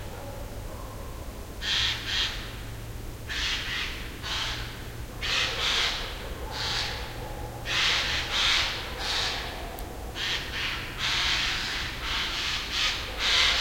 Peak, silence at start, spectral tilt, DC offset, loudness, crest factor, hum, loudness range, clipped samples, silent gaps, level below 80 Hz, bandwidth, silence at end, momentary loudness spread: -10 dBFS; 0 s; -1.5 dB/octave; under 0.1%; -27 LUFS; 20 dB; none; 4 LU; under 0.1%; none; -40 dBFS; 16.5 kHz; 0 s; 16 LU